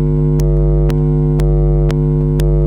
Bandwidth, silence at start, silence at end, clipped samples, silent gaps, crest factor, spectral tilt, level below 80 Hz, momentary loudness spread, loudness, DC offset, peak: 7 kHz; 0 s; 0 s; under 0.1%; none; 8 dB; -9.5 dB/octave; -16 dBFS; 1 LU; -14 LUFS; under 0.1%; -4 dBFS